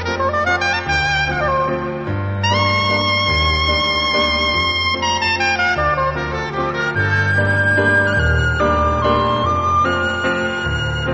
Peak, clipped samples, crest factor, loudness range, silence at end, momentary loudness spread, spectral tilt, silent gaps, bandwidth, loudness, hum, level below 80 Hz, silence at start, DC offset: -4 dBFS; under 0.1%; 14 dB; 1 LU; 0 s; 5 LU; -5 dB/octave; none; 8.6 kHz; -16 LUFS; none; -30 dBFS; 0 s; under 0.1%